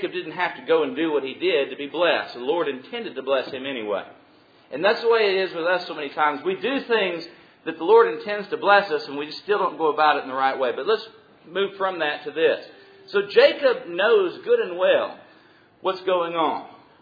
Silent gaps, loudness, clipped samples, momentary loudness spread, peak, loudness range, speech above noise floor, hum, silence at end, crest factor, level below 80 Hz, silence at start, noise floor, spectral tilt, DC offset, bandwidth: none; -22 LUFS; under 0.1%; 12 LU; -2 dBFS; 4 LU; 32 dB; none; 0.3 s; 20 dB; -76 dBFS; 0 s; -54 dBFS; -6 dB/octave; under 0.1%; 5 kHz